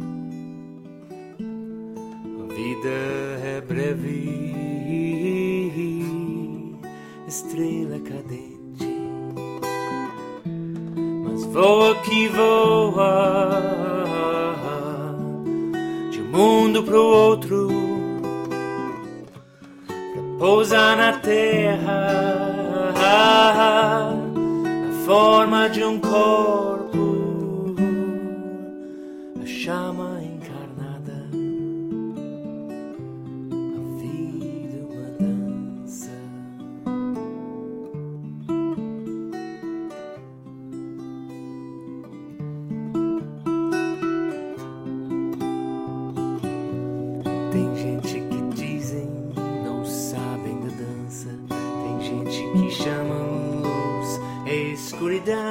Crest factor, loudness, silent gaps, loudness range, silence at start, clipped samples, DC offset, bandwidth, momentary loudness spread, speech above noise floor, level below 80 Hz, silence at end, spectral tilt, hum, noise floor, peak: 20 dB; -22 LUFS; none; 13 LU; 0 s; under 0.1%; under 0.1%; 16.5 kHz; 19 LU; 27 dB; -60 dBFS; 0 s; -5.5 dB/octave; none; -44 dBFS; -2 dBFS